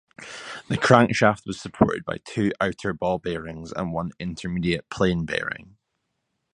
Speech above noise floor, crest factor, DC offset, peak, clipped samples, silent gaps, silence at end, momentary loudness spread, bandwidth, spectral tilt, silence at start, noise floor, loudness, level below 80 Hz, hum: 53 dB; 24 dB; under 0.1%; 0 dBFS; under 0.1%; none; 0.9 s; 16 LU; 11 kHz; -6 dB/octave; 0.2 s; -77 dBFS; -24 LUFS; -48 dBFS; none